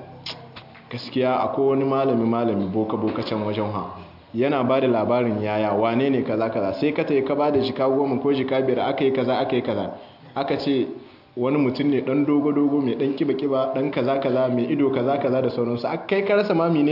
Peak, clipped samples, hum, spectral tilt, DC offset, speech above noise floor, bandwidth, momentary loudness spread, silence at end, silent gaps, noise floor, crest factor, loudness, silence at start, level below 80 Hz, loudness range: -8 dBFS; under 0.1%; none; -9 dB/octave; under 0.1%; 22 dB; 5.8 kHz; 10 LU; 0 s; none; -43 dBFS; 14 dB; -22 LUFS; 0 s; -64 dBFS; 2 LU